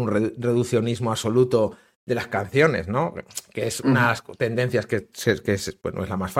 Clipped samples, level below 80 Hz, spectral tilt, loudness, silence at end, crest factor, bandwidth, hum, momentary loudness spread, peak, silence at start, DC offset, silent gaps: under 0.1%; -54 dBFS; -5.5 dB/octave; -23 LUFS; 0 s; 20 dB; 16.5 kHz; none; 9 LU; -4 dBFS; 0 s; under 0.1%; 1.96-2.07 s